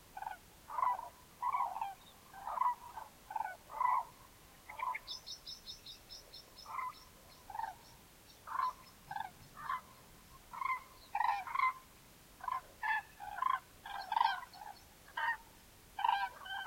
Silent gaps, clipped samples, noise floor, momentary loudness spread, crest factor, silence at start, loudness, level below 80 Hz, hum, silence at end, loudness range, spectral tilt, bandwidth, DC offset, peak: none; under 0.1%; -61 dBFS; 22 LU; 24 dB; 0 s; -40 LUFS; -68 dBFS; none; 0 s; 7 LU; -1.5 dB/octave; 16.5 kHz; under 0.1%; -18 dBFS